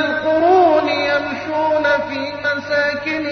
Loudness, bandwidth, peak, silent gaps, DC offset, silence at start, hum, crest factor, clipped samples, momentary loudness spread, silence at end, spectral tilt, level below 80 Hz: -17 LUFS; 6.4 kHz; -4 dBFS; none; under 0.1%; 0 s; 50 Hz at -45 dBFS; 14 dB; under 0.1%; 9 LU; 0 s; -5 dB/octave; -56 dBFS